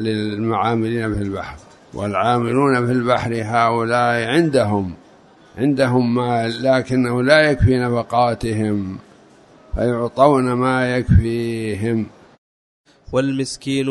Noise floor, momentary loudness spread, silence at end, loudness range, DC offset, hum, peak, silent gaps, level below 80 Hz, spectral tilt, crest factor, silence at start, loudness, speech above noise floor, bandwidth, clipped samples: -48 dBFS; 9 LU; 0 s; 3 LU; under 0.1%; none; 0 dBFS; 12.38-12.84 s; -36 dBFS; -6.5 dB/octave; 18 dB; 0 s; -18 LUFS; 30 dB; 11.5 kHz; under 0.1%